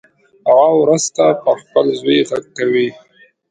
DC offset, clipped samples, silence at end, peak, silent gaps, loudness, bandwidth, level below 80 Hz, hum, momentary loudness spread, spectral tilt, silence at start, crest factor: under 0.1%; under 0.1%; 0.6 s; 0 dBFS; none; -14 LUFS; 9.4 kHz; -64 dBFS; none; 9 LU; -4 dB/octave; 0.45 s; 14 dB